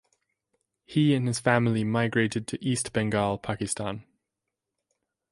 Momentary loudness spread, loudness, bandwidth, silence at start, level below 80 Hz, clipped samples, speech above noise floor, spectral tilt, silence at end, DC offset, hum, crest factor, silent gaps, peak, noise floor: 8 LU; -27 LUFS; 11.5 kHz; 0.9 s; -58 dBFS; under 0.1%; 60 dB; -5.5 dB/octave; 1.3 s; under 0.1%; none; 20 dB; none; -8 dBFS; -86 dBFS